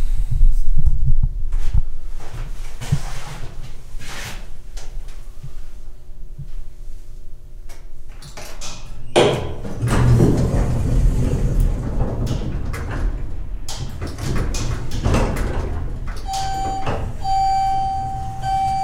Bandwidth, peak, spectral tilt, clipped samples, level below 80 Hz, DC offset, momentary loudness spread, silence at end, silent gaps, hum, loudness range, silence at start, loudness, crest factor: 11.5 kHz; 0 dBFS; -6 dB/octave; under 0.1%; -22 dBFS; under 0.1%; 22 LU; 0 s; none; none; 19 LU; 0 s; -22 LUFS; 18 dB